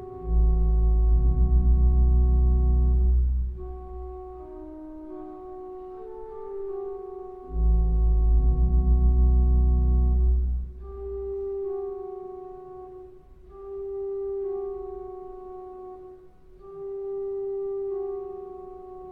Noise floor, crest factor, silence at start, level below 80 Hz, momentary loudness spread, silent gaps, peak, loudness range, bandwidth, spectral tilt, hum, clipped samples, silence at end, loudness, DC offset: -49 dBFS; 12 dB; 0 s; -24 dBFS; 19 LU; none; -12 dBFS; 13 LU; 1.3 kHz; -13.5 dB/octave; none; under 0.1%; 0 s; -26 LUFS; under 0.1%